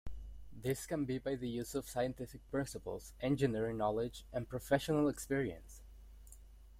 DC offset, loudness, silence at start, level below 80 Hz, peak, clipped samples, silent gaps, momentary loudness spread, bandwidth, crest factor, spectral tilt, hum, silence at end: under 0.1%; -38 LUFS; 0.05 s; -56 dBFS; -18 dBFS; under 0.1%; none; 19 LU; 16.5 kHz; 20 dB; -6 dB/octave; none; 0 s